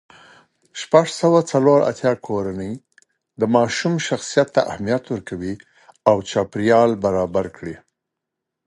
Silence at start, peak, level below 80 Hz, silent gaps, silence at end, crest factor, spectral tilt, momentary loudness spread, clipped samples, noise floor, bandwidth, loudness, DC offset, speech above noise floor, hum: 0.75 s; 0 dBFS; -52 dBFS; none; 0.9 s; 20 dB; -5.5 dB/octave; 16 LU; under 0.1%; -82 dBFS; 11.5 kHz; -19 LUFS; under 0.1%; 63 dB; none